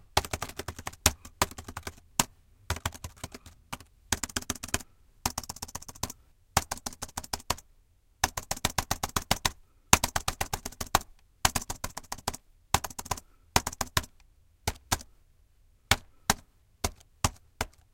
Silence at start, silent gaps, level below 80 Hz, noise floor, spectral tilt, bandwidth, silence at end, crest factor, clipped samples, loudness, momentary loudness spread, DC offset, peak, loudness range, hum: 0.15 s; none; -46 dBFS; -63 dBFS; -2 dB/octave; 17 kHz; 0.25 s; 34 dB; under 0.1%; -32 LUFS; 14 LU; under 0.1%; 0 dBFS; 6 LU; none